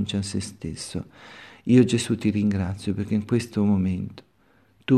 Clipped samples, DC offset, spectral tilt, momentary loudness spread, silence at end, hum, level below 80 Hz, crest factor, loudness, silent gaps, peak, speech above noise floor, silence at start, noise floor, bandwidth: under 0.1%; under 0.1%; -6.5 dB/octave; 18 LU; 0 s; none; -54 dBFS; 18 dB; -24 LUFS; none; -6 dBFS; 37 dB; 0 s; -61 dBFS; 13 kHz